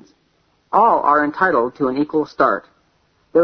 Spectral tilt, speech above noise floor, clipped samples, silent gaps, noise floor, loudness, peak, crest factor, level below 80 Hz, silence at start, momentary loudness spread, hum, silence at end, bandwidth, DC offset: -7.5 dB/octave; 45 dB; under 0.1%; none; -62 dBFS; -17 LUFS; -2 dBFS; 16 dB; -56 dBFS; 0.7 s; 7 LU; none; 0 s; 6.4 kHz; under 0.1%